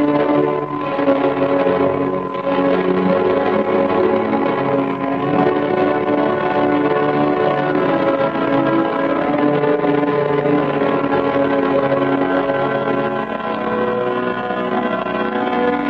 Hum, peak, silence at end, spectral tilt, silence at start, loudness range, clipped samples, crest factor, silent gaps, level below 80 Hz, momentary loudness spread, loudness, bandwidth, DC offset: none; -2 dBFS; 0 s; -9 dB/octave; 0 s; 2 LU; under 0.1%; 14 dB; none; -50 dBFS; 4 LU; -17 LUFS; 5.6 kHz; under 0.1%